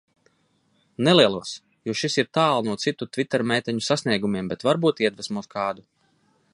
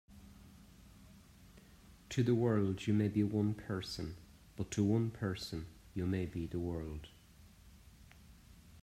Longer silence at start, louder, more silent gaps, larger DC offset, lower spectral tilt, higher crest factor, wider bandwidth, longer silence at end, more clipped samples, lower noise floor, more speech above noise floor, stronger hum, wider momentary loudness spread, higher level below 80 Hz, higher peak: first, 1 s vs 0.1 s; first, -23 LUFS vs -37 LUFS; neither; neither; second, -4.5 dB/octave vs -7 dB/octave; about the same, 22 dB vs 18 dB; second, 11.5 kHz vs 14.5 kHz; first, 0.75 s vs 0 s; neither; first, -66 dBFS vs -61 dBFS; first, 43 dB vs 25 dB; neither; second, 13 LU vs 20 LU; about the same, -64 dBFS vs -60 dBFS; first, -2 dBFS vs -20 dBFS